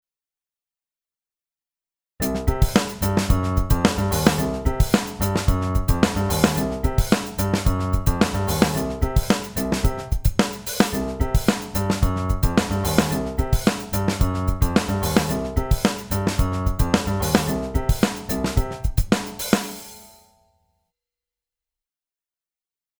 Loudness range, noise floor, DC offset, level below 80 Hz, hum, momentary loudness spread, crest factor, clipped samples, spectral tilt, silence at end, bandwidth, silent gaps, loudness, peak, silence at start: 5 LU; under -90 dBFS; under 0.1%; -28 dBFS; none; 4 LU; 22 dB; under 0.1%; -5.5 dB/octave; 2.95 s; over 20 kHz; none; -22 LUFS; 0 dBFS; 2.2 s